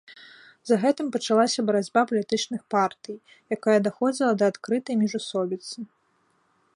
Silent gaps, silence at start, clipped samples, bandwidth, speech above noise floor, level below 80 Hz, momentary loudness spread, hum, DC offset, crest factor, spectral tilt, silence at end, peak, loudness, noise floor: none; 0.1 s; under 0.1%; 11 kHz; 43 dB; -74 dBFS; 16 LU; none; under 0.1%; 18 dB; -4.5 dB/octave; 0.9 s; -6 dBFS; -24 LUFS; -68 dBFS